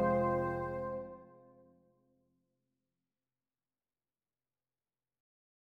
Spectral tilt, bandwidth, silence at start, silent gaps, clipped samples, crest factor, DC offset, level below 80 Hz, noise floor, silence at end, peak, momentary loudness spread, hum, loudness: -9.5 dB/octave; 6 kHz; 0 s; none; under 0.1%; 20 dB; under 0.1%; -64 dBFS; under -90 dBFS; 4.4 s; -20 dBFS; 18 LU; none; -36 LUFS